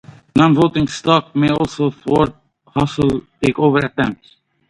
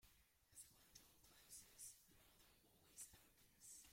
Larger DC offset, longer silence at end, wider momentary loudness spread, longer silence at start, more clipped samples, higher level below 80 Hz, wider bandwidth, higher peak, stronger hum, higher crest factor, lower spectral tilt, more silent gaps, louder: neither; first, 0.55 s vs 0 s; about the same, 7 LU vs 8 LU; first, 0.35 s vs 0 s; neither; first, -42 dBFS vs -82 dBFS; second, 11 kHz vs 16.5 kHz; first, 0 dBFS vs -44 dBFS; neither; second, 16 dB vs 22 dB; first, -6.5 dB/octave vs -0.5 dB/octave; neither; first, -17 LUFS vs -63 LUFS